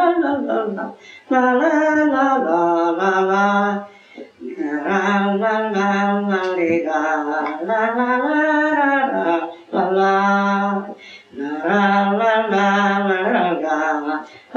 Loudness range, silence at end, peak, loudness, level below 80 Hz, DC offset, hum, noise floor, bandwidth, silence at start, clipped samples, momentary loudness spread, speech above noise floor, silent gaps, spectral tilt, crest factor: 2 LU; 0 s; -4 dBFS; -18 LUFS; -72 dBFS; under 0.1%; none; -39 dBFS; 7.4 kHz; 0 s; under 0.1%; 10 LU; 21 dB; none; -6.5 dB/octave; 14 dB